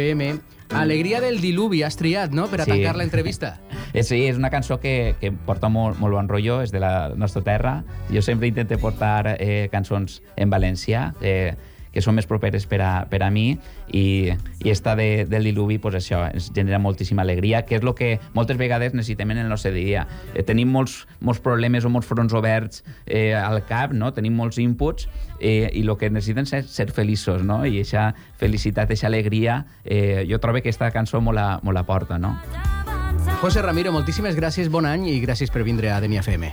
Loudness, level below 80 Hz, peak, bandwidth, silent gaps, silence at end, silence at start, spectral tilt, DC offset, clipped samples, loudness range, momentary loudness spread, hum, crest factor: -22 LUFS; -34 dBFS; -8 dBFS; over 20 kHz; none; 0 s; 0 s; -7 dB/octave; under 0.1%; under 0.1%; 1 LU; 5 LU; none; 14 dB